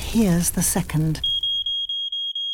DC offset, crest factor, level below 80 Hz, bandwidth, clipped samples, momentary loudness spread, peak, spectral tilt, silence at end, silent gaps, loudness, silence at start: under 0.1%; 14 dB; -38 dBFS; 18.5 kHz; under 0.1%; 4 LU; -8 dBFS; -3.5 dB/octave; 0 s; none; -21 LUFS; 0 s